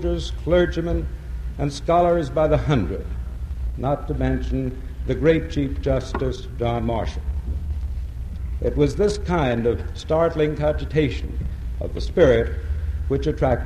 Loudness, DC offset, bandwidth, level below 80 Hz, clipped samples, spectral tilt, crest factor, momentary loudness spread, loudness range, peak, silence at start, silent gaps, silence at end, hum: -23 LUFS; under 0.1%; 10.5 kHz; -28 dBFS; under 0.1%; -7.5 dB/octave; 18 dB; 11 LU; 3 LU; -4 dBFS; 0 s; none; 0 s; none